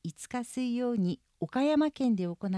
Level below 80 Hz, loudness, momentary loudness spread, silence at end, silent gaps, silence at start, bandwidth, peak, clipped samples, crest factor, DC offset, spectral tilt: -68 dBFS; -31 LUFS; 10 LU; 0 s; none; 0.05 s; 11 kHz; -18 dBFS; under 0.1%; 12 dB; under 0.1%; -6.5 dB/octave